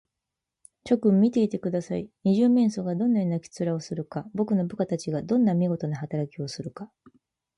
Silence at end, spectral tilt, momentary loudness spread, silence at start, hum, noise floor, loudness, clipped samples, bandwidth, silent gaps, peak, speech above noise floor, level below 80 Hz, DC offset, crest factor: 0.7 s; -8 dB/octave; 13 LU; 0.85 s; none; -86 dBFS; -26 LUFS; under 0.1%; 10.5 kHz; none; -10 dBFS; 61 dB; -66 dBFS; under 0.1%; 16 dB